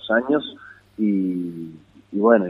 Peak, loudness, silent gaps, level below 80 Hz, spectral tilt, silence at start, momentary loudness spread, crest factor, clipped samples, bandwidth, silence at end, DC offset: -2 dBFS; -22 LUFS; none; -64 dBFS; -8.5 dB/octave; 0.05 s; 19 LU; 20 dB; under 0.1%; 4.1 kHz; 0 s; under 0.1%